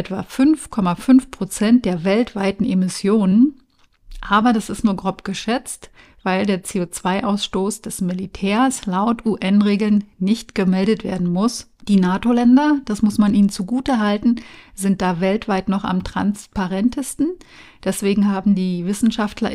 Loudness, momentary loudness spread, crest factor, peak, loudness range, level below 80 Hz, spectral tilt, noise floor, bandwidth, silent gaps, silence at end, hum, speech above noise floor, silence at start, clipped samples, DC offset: -19 LUFS; 9 LU; 14 dB; -4 dBFS; 4 LU; -44 dBFS; -6 dB/octave; -45 dBFS; 15 kHz; none; 0 s; none; 27 dB; 0 s; under 0.1%; under 0.1%